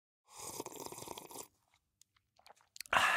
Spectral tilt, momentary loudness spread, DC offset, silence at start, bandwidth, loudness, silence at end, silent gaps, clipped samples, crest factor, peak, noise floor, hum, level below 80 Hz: -1 dB/octave; 21 LU; under 0.1%; 0.3 s; 17.5 kHz; -41 LUFS; 0 s; none; under 0.1%; 28 dB; -14 dBFS; -77 dBFS; none; -72 dBFS